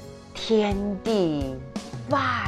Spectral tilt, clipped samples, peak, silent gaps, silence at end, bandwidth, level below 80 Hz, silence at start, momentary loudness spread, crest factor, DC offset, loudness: -6 dB/octave; under 0.1%; -10 dBFS; none; 0 s; 13 kHz; -44 dBFS; 0 s; 12 LU; 16 dB; under 0.1%; -26 LUFS